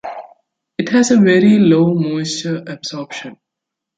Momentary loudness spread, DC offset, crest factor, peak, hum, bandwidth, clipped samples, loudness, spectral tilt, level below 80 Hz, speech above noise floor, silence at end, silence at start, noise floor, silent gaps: 20 LU; under 0.1%; 14 dB; -2 dBFS; none; 9.4 kHz; under 0.1%; -14 LUFS; -5.5 dB/octave; -58 dBFS; 68 dB; 0.65 s; 0.05 s; -81 dBFS; none